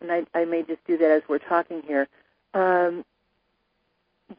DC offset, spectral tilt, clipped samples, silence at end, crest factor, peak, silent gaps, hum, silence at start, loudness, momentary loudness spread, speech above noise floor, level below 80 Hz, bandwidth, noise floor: under 0.1%; -10 dB/octave; under 0.1%; 0.05 s; 18 dB; -6 dBFS; none; none; 0 s; -24 LUFS; 8 LU; 49 dB; -76 dBFS; 5.2 kHz; -73 dBFS